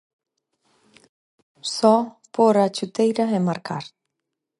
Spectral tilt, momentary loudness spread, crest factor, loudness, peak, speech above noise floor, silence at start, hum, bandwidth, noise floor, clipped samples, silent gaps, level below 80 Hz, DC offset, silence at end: -5.5 dB/octave; 14 LU; 20 dB; -21 LUFS; -2 dBFS; 62 dB; 1.65 s; none; 11.5 kHz; -82 dBFS; under 0.1%; none; -74 dBFS; under 0.1%; 0.7 s